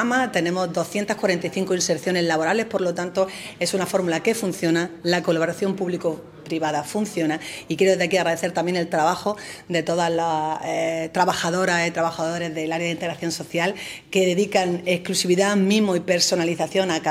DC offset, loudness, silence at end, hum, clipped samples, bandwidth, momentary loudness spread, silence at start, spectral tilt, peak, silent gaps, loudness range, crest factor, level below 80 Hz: under 0.1%; -22 LUFS; 0 s; none; under 0.1%; 16 kHz; 7 LU; 0 s; -4 dB/octave; -4 dBFS; none; 3 LU; 18 dB; -64 dBFS